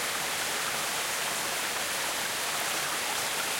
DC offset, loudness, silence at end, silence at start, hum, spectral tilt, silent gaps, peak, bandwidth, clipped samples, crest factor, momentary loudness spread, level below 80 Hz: under 0.1%; -29 LUFS; 0 s; 0 s; none; 0 dB/octave; none; -18 dBFS; 16.5 kHz; under 0.1%; 14 dB; 1 LU; -66 dBFS